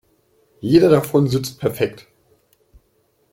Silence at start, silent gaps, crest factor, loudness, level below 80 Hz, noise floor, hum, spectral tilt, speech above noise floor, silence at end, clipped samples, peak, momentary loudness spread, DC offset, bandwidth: 0.65 s; none; 18 dB; -18 LUFS; -52 dBFS; -63 dBFS; none; -7 dB/octave; 46 dB; 1.4 s; under 0.1%; -2 dBFS; 11 LU; under 0.1%; 16.5 kHz